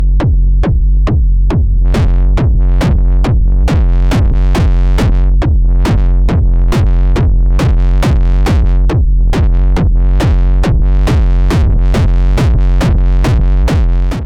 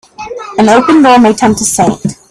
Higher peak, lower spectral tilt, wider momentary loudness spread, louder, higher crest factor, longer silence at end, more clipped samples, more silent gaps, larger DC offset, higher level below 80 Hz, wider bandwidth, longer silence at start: second, -4 dBFS vs 0 dBFS; first, -7.5 dB/octave vs -4.5 dB/octave; second, 1 LU vs 14 LU; second, -12 LUFS vs -7 LUFS; about the same, 4 dB vs 8 dB; second, 0 s vs 0.15 s; second, under 0.1% vs 0.1%; neither; neither; first, -8 dBFS vs -42 dBFS; second, 7.6 kHz vs 14.5 kHz; second, 0 s vs 0.2 s